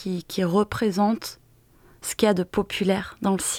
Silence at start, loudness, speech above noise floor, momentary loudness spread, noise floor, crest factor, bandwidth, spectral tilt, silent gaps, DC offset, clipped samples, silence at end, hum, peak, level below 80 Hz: 0 s; -24 LUFS; 32 dB; 9 LU; -56 dBFS; 20 dB; 17 kHz; -5 dB/octave; none; under 0.1%; under 0.1%; 0 s; none; -6 dBFS; -52 dBFS